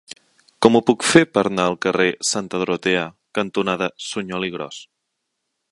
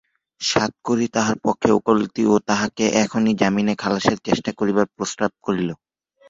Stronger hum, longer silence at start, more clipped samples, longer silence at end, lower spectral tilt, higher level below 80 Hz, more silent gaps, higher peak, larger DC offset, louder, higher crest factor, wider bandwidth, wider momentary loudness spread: neither; second, 0.1 s vs 0.4 s; neither; first, 0.9 s vs 0.55 s; about the same, -4 dB/octave vs -4.5 dB/octave; about the same, -58 dBFS vs -54 dBFS; neither; about the same, 0 dBFS vs -2 dBFS; neither; about the same, -19 LUFS vs -20 LUFS; about the same, 20 dB vs 20 dB; first, 11.5 kHz vs 7.8 kHz; first, 12 LU vs 6 LU